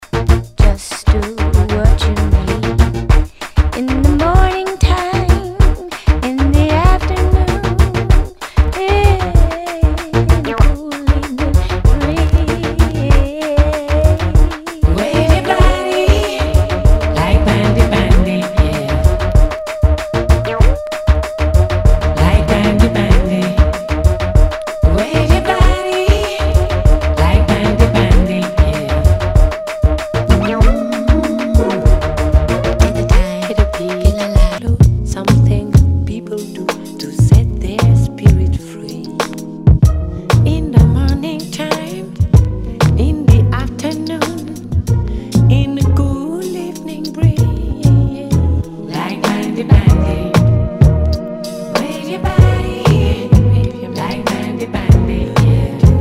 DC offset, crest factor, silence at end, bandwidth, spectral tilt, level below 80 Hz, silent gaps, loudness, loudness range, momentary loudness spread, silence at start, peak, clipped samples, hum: under 0.1%; 12 dB; 0 s; 15 kHz; -7 dB/octave; -16 dBFS; none; -14 LUFS; 2 LU; 8 LU; 0 s; 0 dBFS; 1%; none